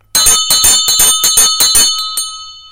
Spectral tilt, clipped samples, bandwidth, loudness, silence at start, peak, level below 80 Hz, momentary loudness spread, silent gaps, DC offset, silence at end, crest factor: 2 dB/octave; 0.3%; over 20 kHz; -7 LUFS; 0.15 s; 0 dBFS; -36 dBFS; 11 LU; none; under 0.1%; 0.1 s; 10 dB